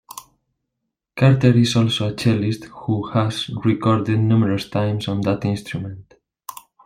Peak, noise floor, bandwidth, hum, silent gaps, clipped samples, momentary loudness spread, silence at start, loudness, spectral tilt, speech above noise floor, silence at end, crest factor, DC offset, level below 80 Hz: -2 dBFS; -79 dBFS; 16 kHz; none; none; under 0.1%; 22 LU; 0.1 s; -19 LUFS; -6.5 dB/octave; 61 dB; 0.35 s; 18 dB; under 0.1%; -52 dBFS